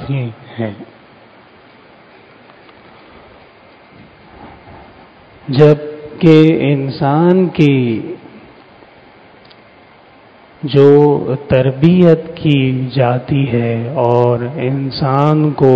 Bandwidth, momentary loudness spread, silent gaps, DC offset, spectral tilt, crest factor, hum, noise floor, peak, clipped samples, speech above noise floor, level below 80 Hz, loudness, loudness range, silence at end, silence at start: 7 kHz; 15 LU; none; under 0.1%; -9.5 dB/octave; 14 dB; none; -43 dBFS; 0 dBFS; 0.6%; 32 dB; -46 dBFS; -12 LUFS; 8 LU; 0 s; 0 s